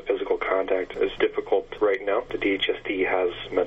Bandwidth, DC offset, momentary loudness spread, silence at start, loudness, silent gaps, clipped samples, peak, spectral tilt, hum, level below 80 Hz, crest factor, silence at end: 7.2 kHz; under 0.1%; 3 LU; 0 s; -25 LUFS; none; under 0.1%; -8 dBFS; -5.5 dB/octave; none; -50 dBFS; 16 dB; 0 s